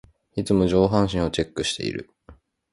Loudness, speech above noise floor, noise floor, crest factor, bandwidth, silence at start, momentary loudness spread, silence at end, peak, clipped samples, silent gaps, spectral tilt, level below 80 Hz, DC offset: -23 LUFS; 30 dB; -52 dBFS; 20 dB; 11.5 kHz; 0.35 s; 12 LU; 0.4 s; -4 dBFS; under 0.1%; none; -5.5 dB/octave; -42 dBFS; under 0.1%